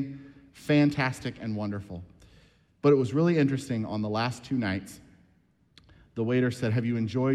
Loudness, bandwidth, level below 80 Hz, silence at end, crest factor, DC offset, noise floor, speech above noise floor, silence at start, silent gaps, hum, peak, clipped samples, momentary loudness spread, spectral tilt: -28 LUFS; 13 kHz; -62 dBFS; 0 s; 18 dB; under 0.1%; -65 dBFS; 39 dB; 0 s; none; none; -10 dBFS; under 0.1%; 17 LU; -7 dB/octave